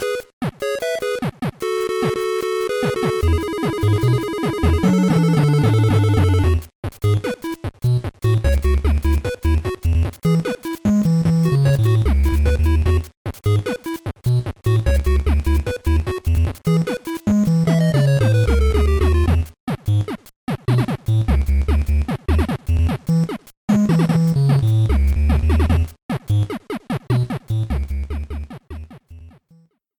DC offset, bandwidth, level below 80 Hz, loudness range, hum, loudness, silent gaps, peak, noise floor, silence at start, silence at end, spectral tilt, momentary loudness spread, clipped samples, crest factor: under 0.1%; 19 kHz; -24 dBFS; 4 LU; none; -19 LUFS; 0.33-0.41 s, 6.75-6.83 s, 13.17-13.25 s, 19.60-19.67 s, 20.36-20.47 s, 23.57-23.68 s, 26.02-26.09 s; -6 dBFS; -54 dBFS; 0 s; 0.7 s; -7.5 dB/octave; 10 LU; under 0.1%; 12 dB